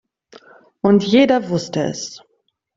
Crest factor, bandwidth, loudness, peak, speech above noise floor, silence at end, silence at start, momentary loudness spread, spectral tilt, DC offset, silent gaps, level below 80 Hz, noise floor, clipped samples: 16 dB; 7.8 kHz; -17 LUFS; -2 dBFS; 31 dB; 0.6 s; 0.85 s; 13 LU; -5.5 dB/octave; under 0.1%; none; -58 dBFS; -47 dBFS; under 0.1%